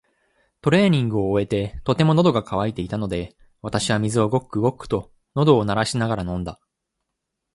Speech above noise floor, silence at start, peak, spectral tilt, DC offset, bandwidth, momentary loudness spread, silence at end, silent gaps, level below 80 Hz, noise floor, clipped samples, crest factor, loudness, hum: 60 dB; 0.65 s; -4 dBFS; -6.5 dB/octave; under 0.1%; 11.5 kHz; 11 LU; 1 s; none; -46 dBFS; -80 dBFS; under 0.1%; 18 dB; -21 LUFS; none